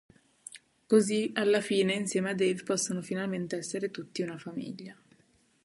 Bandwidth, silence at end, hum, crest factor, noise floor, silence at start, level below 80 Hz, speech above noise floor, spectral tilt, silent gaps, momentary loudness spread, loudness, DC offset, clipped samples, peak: 11.5 kHz; 0.7 s; none; 20 dB; -67 dBFS; 0.55 s; -74 dBFS; 37 dB; -4.5 dB/octave; none; 20 LU; -30 LUFS; under 0.1%; under 0.1%; -10 dBFS